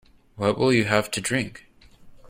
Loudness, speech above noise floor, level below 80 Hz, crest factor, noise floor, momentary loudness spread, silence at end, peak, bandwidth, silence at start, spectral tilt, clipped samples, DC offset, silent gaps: -23 LUFS; 26 dB; -54 dBFS; 22 dB; -48 dBFS; 7 LU; 0.05 s; -4 dBFS; 16 kHz; 0.35 s; -4.5 dB/octave; under 0.1%; under 0.1%; none